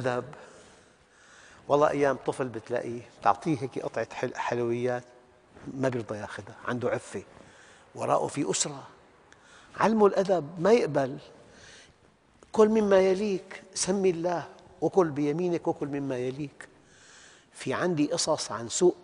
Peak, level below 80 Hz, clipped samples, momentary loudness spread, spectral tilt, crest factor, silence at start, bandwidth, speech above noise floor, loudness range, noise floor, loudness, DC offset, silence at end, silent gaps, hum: -6 dBFS; -66 dBFS; under 0.1%; 16 LU; -5 dB/octave; 22 dB; 0 s; 10.5 kHz; 34 dB; 6 LU; -61 dBFS; -28 LUFS; under 0.1%; 0.05 s; none; none